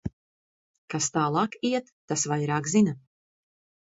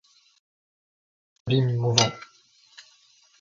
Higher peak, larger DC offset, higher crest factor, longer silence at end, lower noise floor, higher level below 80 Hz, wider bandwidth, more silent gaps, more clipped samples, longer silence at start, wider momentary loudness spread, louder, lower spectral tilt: second, -12 dBFS vs -2 dBFS; neither; second, 18 dB vs 28 dB; second, 0.95 s vs 1.15 s; first, under -90 dBFS vs -59 dBFS; about the same, -58 dBFS vs -58 dBFS; about the same, 8 kHz vs 7.8 kHz; first, 0.13-0.88 s, 1.92-2.08 s vs none; neither; second, 0.05 s vs 1.45 s; second, 10 LU vs 19 LU; second, -27 LUFS vs -23 LUFS; about the same, -4.5 dB/octave vs -4 dB/octave